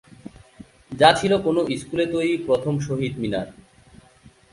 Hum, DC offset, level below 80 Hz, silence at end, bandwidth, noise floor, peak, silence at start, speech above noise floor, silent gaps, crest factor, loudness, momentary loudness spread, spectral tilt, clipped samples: none; under 0.1%; -52 dBFS; 1 s; 11.5 kHz; -52 dBFS; 0 dBFS; 0.25 s; 31 dB; none; 22 dB; -21 LUFS; 11 LU; -5.5 dB/octave; under 0.1%